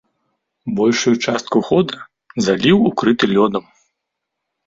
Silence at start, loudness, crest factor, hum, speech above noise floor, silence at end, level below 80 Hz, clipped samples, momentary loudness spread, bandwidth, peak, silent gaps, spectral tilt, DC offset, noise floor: 0.65 s; -16 LUFS; 16 dB; none; 63 dB; 1.05 s; -54 dBFS; under 0.1%; 13 LU; 7.8 kHz; -2 dBFS; none; -5 dB/octave; under 0.1%; -78 dBFS